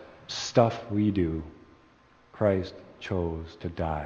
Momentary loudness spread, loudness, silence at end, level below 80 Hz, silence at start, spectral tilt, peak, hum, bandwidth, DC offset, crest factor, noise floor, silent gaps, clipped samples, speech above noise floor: 14 LU; -29 LUFS; 0 s; -48 dBFS; 0 s; -6.5 dB/octave; -6 dBFS; none; 7.4 kHz; under 0.1%; 24 dB; -59 dBFS; none; under 0.1%; 31 dB